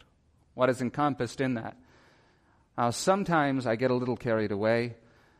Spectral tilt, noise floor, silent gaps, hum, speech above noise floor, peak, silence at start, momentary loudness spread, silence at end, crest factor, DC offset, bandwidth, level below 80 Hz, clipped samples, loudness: -5.5 dB/octave; -65 dBFS; none; none; 37 dB; -12 dBFS; 0.55 s; 10 LU; 0.45 s; 18 dB; under 0.1%; 14.5 kHz; -64 dBFS; under 0.1%; -28 LUFS